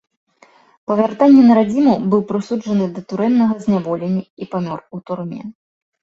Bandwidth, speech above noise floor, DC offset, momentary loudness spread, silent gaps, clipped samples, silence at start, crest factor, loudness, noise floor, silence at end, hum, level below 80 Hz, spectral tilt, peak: 7.8 kHz; 35 dB; under 0.1%; 18 LU; 4.30-4.37 s; under 0.1%; 0.9 s; 14 dB; -16 LUFS; -51 dBFS; 0.5 s; none; -58 dBFS; -8.5 dB/octave; -2 dBFS